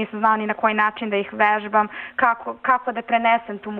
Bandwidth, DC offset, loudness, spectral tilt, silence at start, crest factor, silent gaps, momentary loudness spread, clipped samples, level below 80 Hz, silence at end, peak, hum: 4.6 kHz; under 0.1%; -20 LUFS; -7.5 dB/octave; 0 s; 16 dB; none; 5 LU; under 0.1%; -66 dBFS; 0 s; -6 dBFS; none